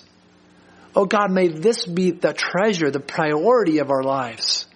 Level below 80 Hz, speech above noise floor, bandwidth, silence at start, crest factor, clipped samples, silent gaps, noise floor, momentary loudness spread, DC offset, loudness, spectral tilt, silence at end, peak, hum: -66 dBFS; 34 dB; 10 kHz; 0.95 s; 18 dB; under 0.1%; none; -53 dBFS; 5 LU; under 0.1%; -20 LUFS; -4.5 dB/octave; 0.1 s; -2 dBFS; none